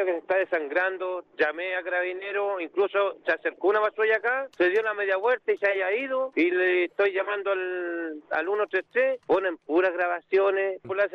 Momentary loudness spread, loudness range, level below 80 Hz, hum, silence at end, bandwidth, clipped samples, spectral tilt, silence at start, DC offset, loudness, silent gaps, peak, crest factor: 6 LU; 2 LU; -74 dBFS; none; 0.05 s; 6 kHz; under 0.1%; -5.5 dB/octave; 0 s; under 0.1%; -26 LUFS; none; -14 dBFS; 12 dB